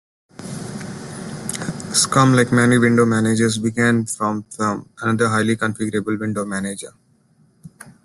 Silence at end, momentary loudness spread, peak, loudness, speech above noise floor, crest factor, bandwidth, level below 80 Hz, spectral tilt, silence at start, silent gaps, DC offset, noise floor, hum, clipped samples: 0.15 s; 17 LU; -2 dBFS; -18 LUFS; 39 dB; 18 dB; 12.5 kHz; -54 dBFS; -5 dB/octave; 0.4 s; none; under 0.1%; -57 dBFS; none; under 0.1%